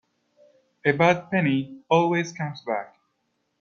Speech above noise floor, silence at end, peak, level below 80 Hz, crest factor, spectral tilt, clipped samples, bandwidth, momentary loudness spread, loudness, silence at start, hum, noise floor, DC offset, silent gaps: 51 dB; 0.75 s; -4 dBFS; -68 dBFS; 22 dB; -6.5 dB/octave; under 0.1%; 7.2 kHz; 11 LU; -24 LUFS; 0.85 s; none; -74 dBFS; under 0.1%; none